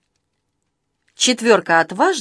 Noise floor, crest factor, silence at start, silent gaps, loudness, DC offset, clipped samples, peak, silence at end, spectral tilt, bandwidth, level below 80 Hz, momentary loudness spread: -73 dBFS; 18 dB; 1.2 s; none; -16 LUFS; under 0.1%; under 0.1%; 0 dBFS; 0 s; -2 dB/octave; 11 kHz; -74 dBFS; 4 LU